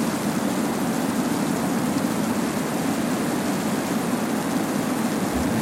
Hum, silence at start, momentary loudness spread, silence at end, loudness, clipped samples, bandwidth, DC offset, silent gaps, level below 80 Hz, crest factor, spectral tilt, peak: none; 0 s; 1 LU; 0 s; -24 LUFS; under 0.1%; 16.5 kHz; under 0.1%; none; -50 dBFS; 12 dB; -5 dB/octave; -10 dBFS